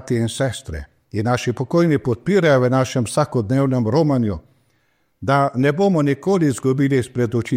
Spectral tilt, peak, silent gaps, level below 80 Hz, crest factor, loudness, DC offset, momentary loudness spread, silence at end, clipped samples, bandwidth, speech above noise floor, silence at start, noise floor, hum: -6.5 dB/octave; -4 dBFS; none; -46 dBFS; 14 dB; -19 LUFS; under 0.1%; 8 LU; 0 s; under 0.1%; 15.5 kHz; 47 dB; 0 s; -65 dBFS; none